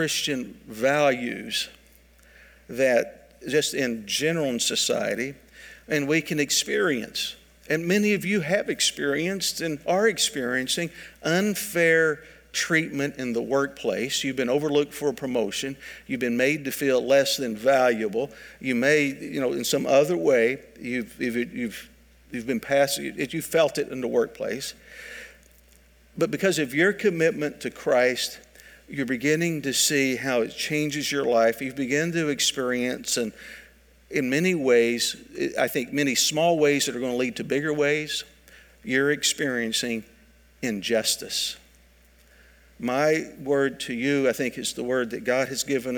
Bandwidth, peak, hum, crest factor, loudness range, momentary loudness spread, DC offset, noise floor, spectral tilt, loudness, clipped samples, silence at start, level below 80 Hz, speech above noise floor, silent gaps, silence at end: 19.5 kHz; -6 dBFS; none; 18 dB; 4 LU; 11 LU; under 0.1%; -56 dBFS; -3.5 dB/octave; -24 LUFS; under 0.1%; 0 s; -60 dBFS; 32 dB; none; 0 s